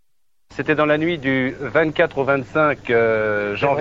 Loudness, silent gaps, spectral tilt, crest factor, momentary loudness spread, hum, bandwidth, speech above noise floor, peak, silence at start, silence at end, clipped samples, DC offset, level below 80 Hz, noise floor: -19 LUFS; none; -7.5 dB/octave; 16 dB; 4 LU; none; 7.6 kHz; 57 dB; -2 dBFS; 0.5 s; 0 s; under 0.1%; under 0.1%; -50 dBFS; -75 dBFS